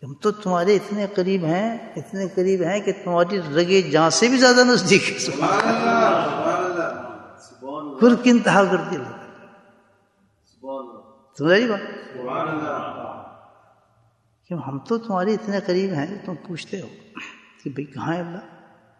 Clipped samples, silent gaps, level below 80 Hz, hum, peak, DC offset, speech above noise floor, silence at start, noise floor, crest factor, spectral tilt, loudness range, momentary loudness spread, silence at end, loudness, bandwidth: under 0.1%; none; -68 dBFS; none; -2 dBFS; under 0.1%; 43 dB; 0 s; -63 dBFS; 20 dB; -4.5 dB/octave; 11 LU; 19 LU; 0.5 s; -20 LUFS; 11.5 kHz